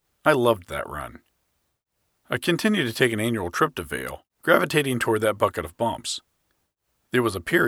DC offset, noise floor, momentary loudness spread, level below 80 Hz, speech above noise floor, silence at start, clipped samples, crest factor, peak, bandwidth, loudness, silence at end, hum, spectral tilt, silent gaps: under 0.1%; -75 dBFS; 12 LU; -54 dBFS; 51 dB; 0.25 s; under 0.1%; 24 dB; -2 dBFS; 18.5 kHz; -24 LUFS; 0 s; none; -4.5 dB/octave; none